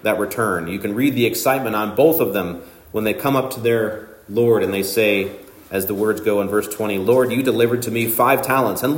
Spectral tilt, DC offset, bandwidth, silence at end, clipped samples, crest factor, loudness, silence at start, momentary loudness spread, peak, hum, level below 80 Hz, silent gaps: -5 dB/octave; under 0.1%; 16.5 kHz; 0 s; under 0.1%; 18 dB; -19 LUFS; 0.05 s; 8 LU; -2 dBFS; none; -56 dBFS; none